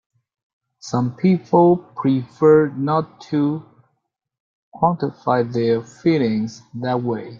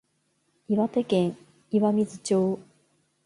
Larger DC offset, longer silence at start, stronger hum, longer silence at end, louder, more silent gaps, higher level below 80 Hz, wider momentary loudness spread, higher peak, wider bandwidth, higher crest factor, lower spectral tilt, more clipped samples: neither; first, 0.85 s vs 0.7 s; neither; second, 0 s vs 0.65 s; first, -19 LUFS vs -26 LUFS; first, 4.40-4.72 s vs none; first, -60 dBFS vs -70 dBFS; first, 10 LU vs 6 LU; first, -2 dBFS vs -12 dBFS; second, 7.4 kHz vs 11.5 kHz; about the same, 18 dB vs 16 dB; about the same, -8 dB/octave vs -7 dB/octave; neither